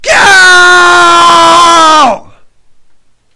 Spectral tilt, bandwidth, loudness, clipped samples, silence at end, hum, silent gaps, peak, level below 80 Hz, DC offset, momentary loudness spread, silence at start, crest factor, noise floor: -1 dB/octave; 12 kHz; -2 LUFS; 7%; 0.35 s; none; none; 0 dBFS; -40 dBFS; under 0.1%; 5 LU; 0.05 s; 4 dB; -40 dBFS